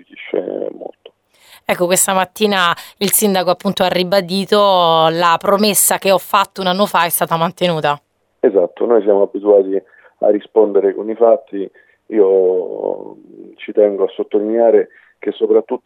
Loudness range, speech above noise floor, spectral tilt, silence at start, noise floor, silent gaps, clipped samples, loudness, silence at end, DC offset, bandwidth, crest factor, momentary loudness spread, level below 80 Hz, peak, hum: 4 LU; 33 dB; -3.5 dB/octave; 0.15 s; -47 dBFS; none; under 0.1%; -14 LUFS; 0.1 s; under 0.1%; 20 kHz; 14 dB; 12 LU; -64 dBFS; 0 dBFS; none